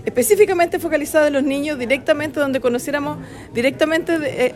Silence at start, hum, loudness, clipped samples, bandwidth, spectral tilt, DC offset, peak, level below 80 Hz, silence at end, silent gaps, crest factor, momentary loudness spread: 0 s; none; -18 LUFS; under 0.1%; 16 kHz; -4 dB/octave; under 0.1%; -2 dBFS; -50 dBFS; 0 s; none; 18 dB; 8 LU